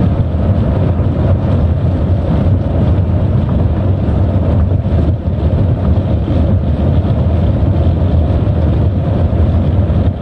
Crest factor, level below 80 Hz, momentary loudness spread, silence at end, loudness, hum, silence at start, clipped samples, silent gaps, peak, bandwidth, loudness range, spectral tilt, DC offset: 8 dB; -20 dBFS; 1 LU; 0 s; -13 LUFS; none; 0 s; under 0.1%; none; -4 dBFS; 4.5 kHz; 1 LU; -11 dB/octave; under 0.1%